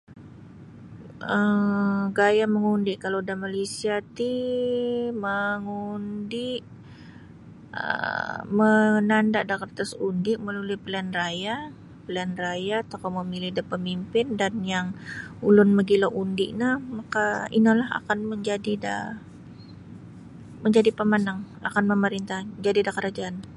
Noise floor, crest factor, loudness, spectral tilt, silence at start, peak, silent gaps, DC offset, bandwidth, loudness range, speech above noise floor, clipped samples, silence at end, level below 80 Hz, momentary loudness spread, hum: -46 dBFS; 18 dB; -25 LUFS; -6 dB/octave; 0.1 s; -6 dBFS; none; under 0.1%; 11.5 kHz; 6 LU; 21 dB; under 0.1%; 0 s; -60 dBFS; 16 LU; none